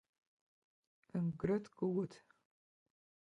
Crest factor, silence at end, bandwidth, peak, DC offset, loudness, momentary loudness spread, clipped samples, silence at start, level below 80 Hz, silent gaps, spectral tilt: 20 dB; 1.15 s; 9.2 kHz; -22 dBFS; under 0.1%; -40 LUFS; 7 LU; under 0.1%; 1.15 s; -70 dBFS; none; -9 dB/octave